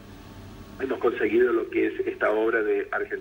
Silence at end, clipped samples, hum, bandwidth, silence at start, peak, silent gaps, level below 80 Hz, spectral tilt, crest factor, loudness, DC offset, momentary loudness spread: 0 s; under 0.1%; none; 16.5 kHz; 0 s; -10 dBFS; none; -54 dBFS; -6.5 dB/octave; 16 dB; -25 LUFS; under 0.1%; 22 LU